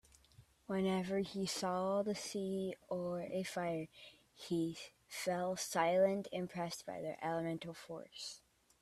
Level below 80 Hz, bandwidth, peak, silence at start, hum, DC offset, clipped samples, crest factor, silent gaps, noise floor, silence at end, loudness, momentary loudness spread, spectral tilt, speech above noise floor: -74 dBFS; 14 kHz; -20 dBFS; 0.4 s; none; under 0.1%; under 0.1%; 20 dB; none; -66 dBFS; 0.45 s; -39 LUFS; 15 LU; -5 dB/octave; 27 dB